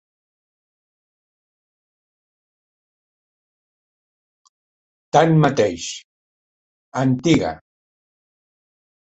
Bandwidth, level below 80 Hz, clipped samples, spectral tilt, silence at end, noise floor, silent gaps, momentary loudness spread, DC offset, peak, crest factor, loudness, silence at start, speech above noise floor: 8.2 kHz; -56 dBFS; under 0.1%; -6 dB/octave; 1.6 s; under -90 dBFS; 6.04-6.92 s; 15 LU; under 0.1%; -2 dBFS; 22 dB; -18 LUFS; 5.15 s; over 73 dB